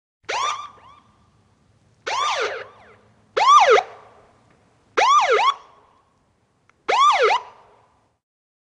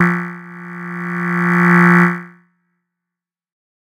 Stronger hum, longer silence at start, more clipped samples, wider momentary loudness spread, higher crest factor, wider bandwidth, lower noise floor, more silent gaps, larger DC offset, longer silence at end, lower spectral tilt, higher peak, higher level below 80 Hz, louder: neither; first, 0.3 s vs 0 s; neither; about the same, 21 LU vs 20 LU; about the same, 18 dB vs 16 dB; first, 10.5 kHz vs 8.2 kHz; second, -64 dBFS vs -85 dBFS; neither; neither; second, 1.2 s vs 1.55 s; second, 0 dB/octave vs -8 dB/octave; second, -4 dBFS vs 0 dBFS; about the same, -68 dBFS vs -66 dBFS; second, -18 LUFS vs -14 LUFS